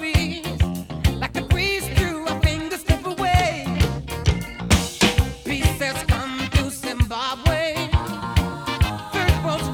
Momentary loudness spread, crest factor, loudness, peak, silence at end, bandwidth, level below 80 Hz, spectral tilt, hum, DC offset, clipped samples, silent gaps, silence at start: 5 LU; 18 dB; -22 LUFS; -4 dBFS; 0 s; 18.5 kHz; -28 dBFS; -5 dB/octave; none; under 0.1%; under 0.1%; none; 0 s